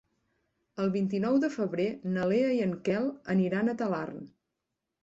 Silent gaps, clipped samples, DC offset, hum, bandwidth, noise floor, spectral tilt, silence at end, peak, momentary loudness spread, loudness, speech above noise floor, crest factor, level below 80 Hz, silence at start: none; under 0.1%; under 0.1%; none; 7.8 kHz; -85 dBFS; -8 dB/octave; 0.75 s; -16 dBFS; 7 LU; -29 LUFS; 57 dB; 14 dB; -70 dBFS; 0.75 s